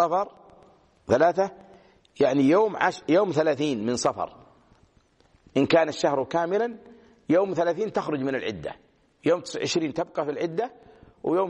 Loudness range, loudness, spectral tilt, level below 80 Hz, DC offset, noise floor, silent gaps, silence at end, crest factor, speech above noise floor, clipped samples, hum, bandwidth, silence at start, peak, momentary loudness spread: 4 LU; -25 LUFS; -5 dB/octave; -64 dBFS; under 0.1%; -62 dBFS; none; 0 s; 20 dB; 38 dB; under 0.1%; none; 9.6 kHz; 0 s; -6 dBFS; 13 LU